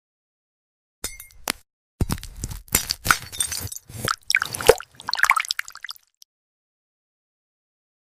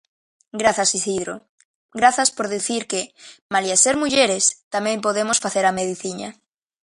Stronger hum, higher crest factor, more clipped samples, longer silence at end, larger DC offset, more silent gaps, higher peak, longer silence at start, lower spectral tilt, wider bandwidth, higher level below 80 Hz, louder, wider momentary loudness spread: neither; about the same, 26 dB vs 22 dB; neither; first, 2.1 s vs 0.5 s; neither; second, 1.73-1.99 s vs 1.49-1.58 s, 1.65-1.89 s, 3.42-3.49 s, 4.63-4.71 s; about the same, 0 dBFS vs 0 dBFS; first, 1.05 s vs 0.55 s; about the same, -2 dB/octave vs -1.5 dB/octave; first, 16 kHz vs 11.5 kHz; first, -42 dBFS vs -60 dBFS; second, -23 LUFS vs -19 LUFS; about the same, 16 LU vs 16 LU